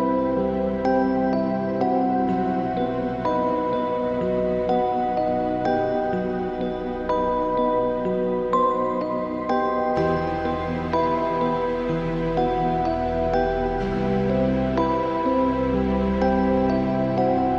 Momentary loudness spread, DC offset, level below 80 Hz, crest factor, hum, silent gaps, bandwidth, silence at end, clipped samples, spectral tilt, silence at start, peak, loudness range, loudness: 4 LU; under 0.1%; -40 dBFS; 14 dB; none; none; 7.4 kHz; 0 s; under 0.1%; -8.5 dB/octave; 0 s; -8 dBFS; 2 LU; -23 LUFS